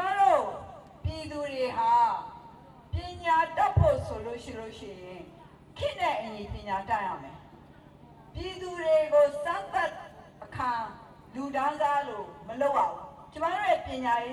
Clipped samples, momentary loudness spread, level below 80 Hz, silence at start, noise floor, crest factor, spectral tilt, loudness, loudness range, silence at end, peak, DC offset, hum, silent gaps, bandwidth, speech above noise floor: under 0.1%; 21 LU; -50 dBFS; 0 s; -52 dBFS; 20 dB; -6 dB/octave; -29 LUFS; 7 LU; 0 s; -10 dBFS; under 0.1%; none; none; 12.5 kHz; 23 dB